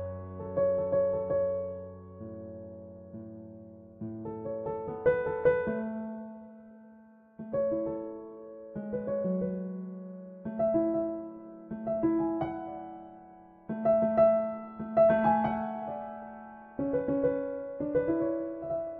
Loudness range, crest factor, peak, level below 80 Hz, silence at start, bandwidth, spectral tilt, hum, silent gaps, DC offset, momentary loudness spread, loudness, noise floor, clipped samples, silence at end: 9 LU; 18 dB; -14 dBFS; -60 dBFS; 0 s; 4 kHz; -8 dB/octave; none; none; under 0.1%; 20 LU; -31 LUFS; -56 dBFS; under 0.1%; 0 s